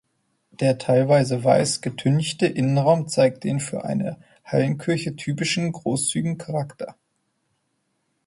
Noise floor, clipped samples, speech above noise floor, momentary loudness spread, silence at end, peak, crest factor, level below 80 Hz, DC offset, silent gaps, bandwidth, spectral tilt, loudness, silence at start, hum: -72 dBFS; under 0.1%; 51 dB; 10 LU; 1.35 s; -4 dBFS; 18 dB; -62 dBFS; under 0.1%; none; 11.5 kHz; -5.5 dB/octave; -22 LUFS; 0.6 s; none